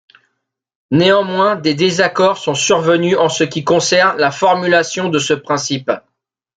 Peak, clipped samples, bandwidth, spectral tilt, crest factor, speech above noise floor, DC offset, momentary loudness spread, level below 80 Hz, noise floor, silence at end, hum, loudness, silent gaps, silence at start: 0 dBFS; under 0.1%; 9.4 kHz; -4 dB/octave; 14 dB; 59 dB; under 0.1%; 6 LU; -58 dBFS; -73 dBFS; 0.6 s; none; -14 LUFS; none; 0.9 s